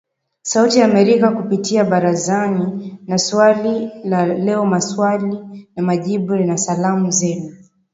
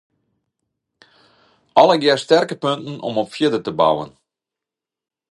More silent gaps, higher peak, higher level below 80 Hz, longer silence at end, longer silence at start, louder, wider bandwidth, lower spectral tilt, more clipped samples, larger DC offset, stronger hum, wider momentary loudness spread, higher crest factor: neither; about the same, 0 dBFS vs 0 dBFS; about the same, -62 dBFS vs -64 dBFS; second, 0.35 s vs 1.25 s; second, 0.45 s vs 1.75 s; about the same, -16 LUFS vs -17 LUFS; second, 8 kHz vs 11.5 kHz; about the same, -5 dB/octave vs -5 dB/octave; neither; neither; neither; about the same, 11 LU vs 11 LU; about the same, 16 dB vs 20 dB